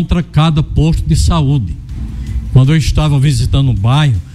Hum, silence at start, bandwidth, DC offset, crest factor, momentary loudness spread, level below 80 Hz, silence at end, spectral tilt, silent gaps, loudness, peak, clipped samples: none; 0 s; 12.5 kHz; under 0.1%; 12 dB; 11 LU; -20 dBFS; 0 s; -6.5 dB/octave; none; -12 LUFS; 0 dBFS; under 0.1%